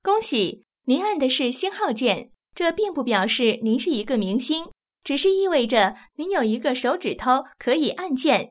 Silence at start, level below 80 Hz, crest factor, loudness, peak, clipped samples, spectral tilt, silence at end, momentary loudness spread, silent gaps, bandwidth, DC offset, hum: 0.05 s; -60 dBFS; 18 dB; -23 LUFS; -6 dBFS; under 0.1%; -9 dB/octave; 0.05 s; 7 LU; none; 4 kHz; under 0.1%; none